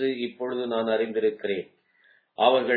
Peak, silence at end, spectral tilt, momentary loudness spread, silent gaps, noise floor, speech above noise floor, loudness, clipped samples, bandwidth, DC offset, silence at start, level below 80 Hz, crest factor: -6 dBFS; 0 s; -7.5 dB/octave; 11 LU; none; -62 dBFS; 37 dB; -26 LUFS; under 0.1%; 4.7 kHz; under 0.1%; 0 s; -80 dBFS; 20 dB